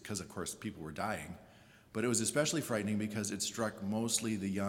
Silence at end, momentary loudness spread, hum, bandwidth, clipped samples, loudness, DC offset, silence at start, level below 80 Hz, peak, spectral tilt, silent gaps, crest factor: 0 s; 11 LU; none; 18 kHz; under 0.1%; -36 LUFS; under 0.1%; 0 s; -70 dBFS; -16 dBFS; -3.5 dB/octave; none; 20 dB